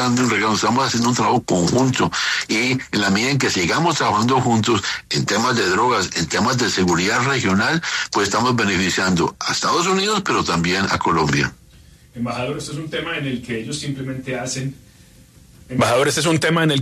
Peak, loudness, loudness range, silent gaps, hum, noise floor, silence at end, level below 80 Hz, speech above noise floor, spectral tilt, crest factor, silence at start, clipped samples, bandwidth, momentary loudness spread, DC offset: -6 dBFS; -18 LUFS; 8 LU; none; none; -47 dBFS; 0 s; -48 dBFS; 29 dB; -4 dB/octave; 14 dB; 0 s; under 0.1%; 13.5 kHz; 9 LU; under 0.1%